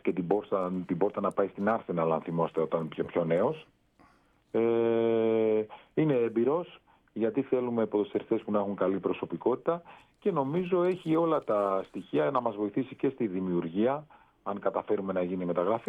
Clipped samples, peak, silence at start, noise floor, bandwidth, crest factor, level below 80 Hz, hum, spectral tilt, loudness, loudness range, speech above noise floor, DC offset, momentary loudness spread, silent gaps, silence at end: under 0.1%; -12 dBFS; 0.05 s; -64 dBFS; 4.5 kHz; 18 dB; -72 dBFS; none; -9.5 dB/octave; -30 LUFS; 2 LU; 35 dB; under 0.1%; 6 LU; none; 0.05 s